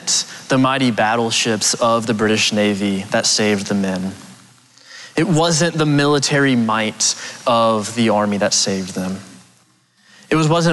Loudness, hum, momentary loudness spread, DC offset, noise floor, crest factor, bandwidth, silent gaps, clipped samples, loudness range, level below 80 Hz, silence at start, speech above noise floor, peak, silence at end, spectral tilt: -16 LUFS; none; 8 LU; under 0.1%; -56 dBFS; 12 dB; 12.5 kHz; none; under 0.1%; 3 LU; -56 dBFS; 0 s; 39 dB; -6 dBFS; 0 s; -3.5 dB/octave